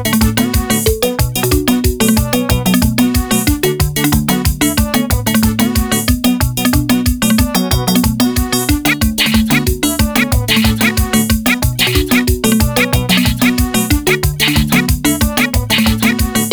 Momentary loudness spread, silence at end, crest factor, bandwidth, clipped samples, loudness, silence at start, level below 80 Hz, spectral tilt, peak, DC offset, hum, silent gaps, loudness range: 3 LU; 0 s; 10 dB; over 20 kHz; under 0.1%; -13 LUFS; 0 s; -22 dBFS; -4 dB/octave; -2 dBFS; under 0.1%; none; none; 1 LU